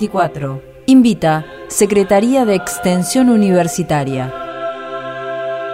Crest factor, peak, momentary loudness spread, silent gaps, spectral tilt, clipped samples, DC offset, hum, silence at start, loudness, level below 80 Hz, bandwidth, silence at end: 14 dB; 0 dBFS; 13 LU; none; -5.5 dB/octave; under 0.1%; under 0.1%; none; 0 s; -15 LUFS; -46 dBFS; 16 kHz; 0 s